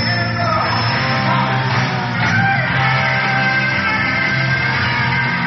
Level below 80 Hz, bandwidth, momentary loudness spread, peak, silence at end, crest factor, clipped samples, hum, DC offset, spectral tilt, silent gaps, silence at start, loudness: -44 dBFS; 6.4 kHz; 2 LU; -4 dBFS; 0 s; 12 dB; under 0.1%; none; under 0.1%; -3 dB/octave; none; 0 s; -15 LUFS